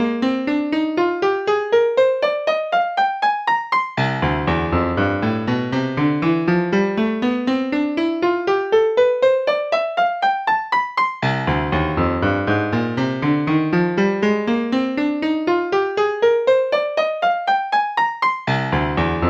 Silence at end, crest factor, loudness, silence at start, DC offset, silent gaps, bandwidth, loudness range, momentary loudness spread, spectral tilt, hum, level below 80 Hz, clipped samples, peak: 0 s; 14 dB; -19 LUFS; 0 s; under 0.1%; none; 8 kHz; 1 LU; 4 LU; -7 dB/octave; none; -40 dBFS; under 0.1%; -6 dBFS